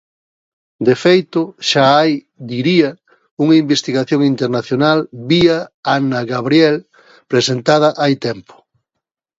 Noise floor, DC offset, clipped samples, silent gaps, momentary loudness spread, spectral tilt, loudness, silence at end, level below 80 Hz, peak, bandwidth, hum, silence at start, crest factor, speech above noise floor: -79 dBFS; under 0.1%; under 0.1%; 3.31-3.37 s, 5.74-5.83 s; 8 LU; -5.5 dB/octave; -14 LUFS; 1 s; -56 dBFS; 0 dBFS; 7.8 kHz; none; 0.8 s; 16 dB; 65 dB